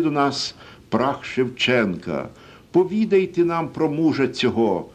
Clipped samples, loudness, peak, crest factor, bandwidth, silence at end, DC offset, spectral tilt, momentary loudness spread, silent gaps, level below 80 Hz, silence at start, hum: under 0.1%; -21 LUFS; -6 dBFS; 14 dB; 9.4 kHz; 0.05 s; under 0.1%; -5.5 dB/octave; 9 LU; none; -54 dBFS; 0 s; none